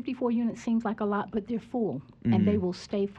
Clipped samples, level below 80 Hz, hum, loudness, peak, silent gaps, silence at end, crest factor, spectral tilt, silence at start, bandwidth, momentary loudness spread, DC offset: under 0.1%; -60 dBFS; none; -29 LUFS; -14 dBFS; none; 0 s; 16 dB; -8 dB/octave; 0 s; 8.4 kHz; 8 LU; under 0.1%